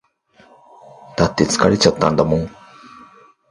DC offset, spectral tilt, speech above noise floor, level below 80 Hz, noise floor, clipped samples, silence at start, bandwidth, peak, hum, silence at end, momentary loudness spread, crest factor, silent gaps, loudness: under 0.1%; -5 dB/octave; 37 dB; -42 dBFS; -52 dBFS; under 0.1%; 1.15 s; 11.5 kHz; 0 dBFS; none; 1 s; 12 LU; 20 dB; none; -16 LUFS